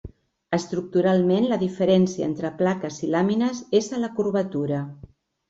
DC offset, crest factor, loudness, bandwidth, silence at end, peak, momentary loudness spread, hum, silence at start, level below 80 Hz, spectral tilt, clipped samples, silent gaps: under 0.1%; 16 dB; -23 LUFS; 7.8 kHz; 0.55 s; -8 dBFS; 8 LU; none; 0.05 s; -56 dBFS; -6.5 dB/octave; under 0.1%; none